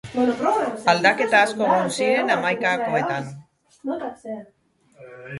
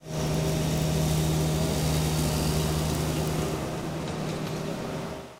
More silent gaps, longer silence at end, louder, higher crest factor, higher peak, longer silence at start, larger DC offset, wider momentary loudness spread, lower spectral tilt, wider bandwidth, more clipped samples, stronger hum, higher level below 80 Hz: neither; about the same, 0 s vs 0 s; first, -21 LUFS vs -28 LUFS; about the same, 18 dB vs 14 dB; first, -4 dBFS vs -14 dBFS; about the same, 0.05 s vs 0 s; neither; first, 18 LU vs 7 LU; about the same, -4.5 dB/octave vs -5.5 dB/octave; second, 11.5 kHz vs 16 kHz; neither; neither; second, -64 dBFS vs -40 dBFS